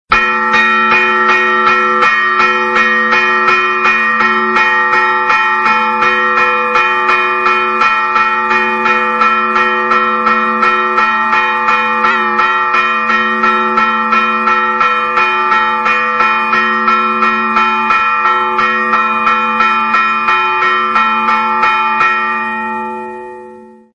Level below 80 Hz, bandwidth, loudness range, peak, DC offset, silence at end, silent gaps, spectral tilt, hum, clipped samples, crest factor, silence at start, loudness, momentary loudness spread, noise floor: -50 dBFS; 9 kHz; 2 LU; 0 dBFS; under 0.1%; 0.3 s; none; -3.5 dB/octave; none; under 0.1%; 12 dB; 0.1 s; -10 LUFS; 2 LU; -35 dBFS